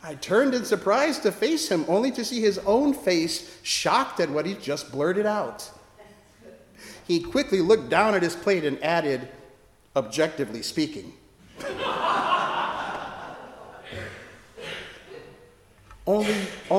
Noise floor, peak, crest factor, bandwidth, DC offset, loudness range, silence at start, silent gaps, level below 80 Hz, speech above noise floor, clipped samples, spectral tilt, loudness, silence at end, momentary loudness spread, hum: -54 dBFS; -6 dBFS; 20 dB; 16.5 kHz; under 0.1%; 8 LU; 0.05 s; none; -58 dBFS; 30 dB; under 0.1%; -4 dB/octave; -25 LUFS; 0 s; 19 LU; none